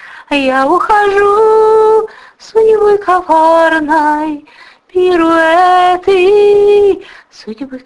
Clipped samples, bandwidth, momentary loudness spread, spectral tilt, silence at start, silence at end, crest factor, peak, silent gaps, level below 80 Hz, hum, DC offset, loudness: under 0.1%; 11 kHz; 12 LU; -4.5 dB/octave; 0 s; 0.1 s; 10 dB; 0 dBFS; none; -44 dBFS; none; under 0.1%; -9 LUFS